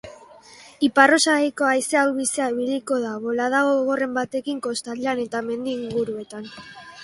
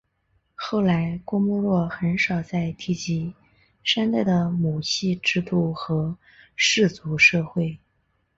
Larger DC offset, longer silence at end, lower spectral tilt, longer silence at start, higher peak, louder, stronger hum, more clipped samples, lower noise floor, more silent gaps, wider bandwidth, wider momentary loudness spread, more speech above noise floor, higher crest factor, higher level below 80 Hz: neither; second, 0 s vs 0.6 s; second, -2.5 dB/octave vs -5 dB/octave; second, 0.05 s vs 0.6 s; first, 0 dBFS vs -4 dBFS; about the same, -21 LUFS vs -23 LUFS; neither; neither; second, -47 dBFS vs -69 dBFS; neither; first, 12 kHz vs 8 kHz; about the same, 13 LU vs 11 LU; second, 25 dB vs 47 dB; about the same, 22 dB vs 20 dB; second, -64 dBFS vs -54 dBFS